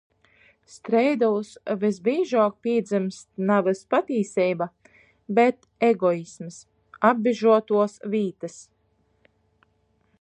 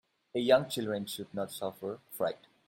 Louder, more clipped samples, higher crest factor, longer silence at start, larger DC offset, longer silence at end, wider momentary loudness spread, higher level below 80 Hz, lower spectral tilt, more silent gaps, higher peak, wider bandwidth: first, -23 LUFS vs -33 LUFS; neither; about the same, 20 dB vs 22 dB; first, 0.75 s vs 0.35 s; neither; first, 1.6 s vs 0.35 s; about the same, 11 LU vs 12 LU; about the same, -72 dBFS vs -74 dBFS; first, -6.5 dB/octave vs -4.5 dB/octave; neither; first, -4 dBFS vs -12 dBFS; second, 10 kHz vs 16.5 kHz